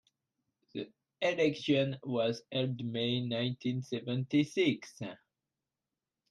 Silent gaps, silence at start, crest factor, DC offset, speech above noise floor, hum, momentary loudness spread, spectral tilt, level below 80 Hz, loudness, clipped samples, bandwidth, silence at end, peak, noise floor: none; 0.75 s; 18 dB; under 0.1%; over 57 dB; none; 14 LU; -6 dB/octave; -76 dBFS; -33 LUFS; under 0.1%; 11.5 kHz; 1.15 s; -16 dBFS; under -90 dBFS